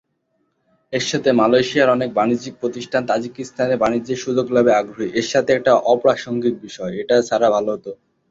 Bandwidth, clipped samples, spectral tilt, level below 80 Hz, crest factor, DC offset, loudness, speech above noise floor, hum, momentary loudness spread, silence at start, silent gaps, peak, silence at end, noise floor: 8 kHz; under 0.1%; -5 dB/octave; -58 dBFS; 16 dB; under 0.1%; -18 LUFS; 51 dB; none; 11 LU; 0.9 s; none; -2 dBFS; 0.35 s; -68 dBFS